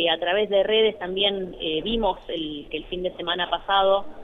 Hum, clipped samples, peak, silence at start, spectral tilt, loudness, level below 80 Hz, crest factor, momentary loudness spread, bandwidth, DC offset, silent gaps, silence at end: none; under 0.1%; -8 dBFS; 0 s; -6.5 dB/octave; -24 LUFS; -46 dBFS; 16 dB; 10 LU; 4.2 kHz; under 0.1%; none; 0 s